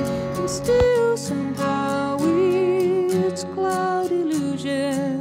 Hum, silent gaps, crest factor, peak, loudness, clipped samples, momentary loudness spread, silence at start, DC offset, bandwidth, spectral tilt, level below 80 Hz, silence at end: none; none; 14 dB; -6 dBFS; -22 LUFS; under 0.1%; 6 LU; 0 s; under 0.1%; 16 kHz; -5.5 dB/octave; -46 dBFS; 0 s